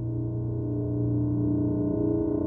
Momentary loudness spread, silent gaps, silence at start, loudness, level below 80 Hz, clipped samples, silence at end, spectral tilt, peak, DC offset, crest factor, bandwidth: 4 LU; none; 0 s; -28 LUFS; -44 dBFS; under 0.1%; 0 s; -14.5 dB/octave; -16 dBFS; under 0.1%; 10 dB; 1.6 kHz